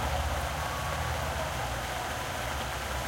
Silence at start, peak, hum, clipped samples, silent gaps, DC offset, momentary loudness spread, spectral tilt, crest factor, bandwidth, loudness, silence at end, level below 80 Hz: 0 s; -18 dBFS; none; under 0.1%; none; under 0.1%; 2 LU; -3.5 dB/octave; 14 dB; 16.5 kHz; -33 LUFS; 0 s; -40 dBFS